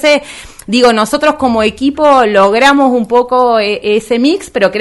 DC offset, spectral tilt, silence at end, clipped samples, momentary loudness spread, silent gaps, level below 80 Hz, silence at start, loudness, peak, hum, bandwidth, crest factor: under 0.1%; -4 dB/octave; 0 s; 0.6%; 6 LU; none; -42 dBFS; 0 s; -10 LUFS; 0 dBFS; none; 12 kHz; 10 dB